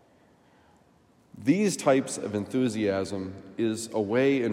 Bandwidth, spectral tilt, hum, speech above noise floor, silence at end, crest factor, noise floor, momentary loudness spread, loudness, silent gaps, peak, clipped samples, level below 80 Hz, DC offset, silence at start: 16 kHz; -5.5 dB/octave; none; 35 dB; 0 s; 18 dB; -61 dBFS; 8 LU; -27 LUFS; none; -10 dBFS; under 0.1%; -72 dBFS; under 0.1%; 1.35 s